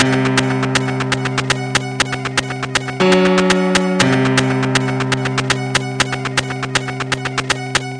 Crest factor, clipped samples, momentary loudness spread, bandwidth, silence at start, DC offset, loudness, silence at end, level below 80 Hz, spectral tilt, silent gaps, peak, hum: 16 dB; under 0.1%; 6 LU; 10.5 kHz; 0 s; under 0.1%; -16 LUFS; 0 s; -44 dBFS; -4.5 dB/octave; none; 0 dBFS; none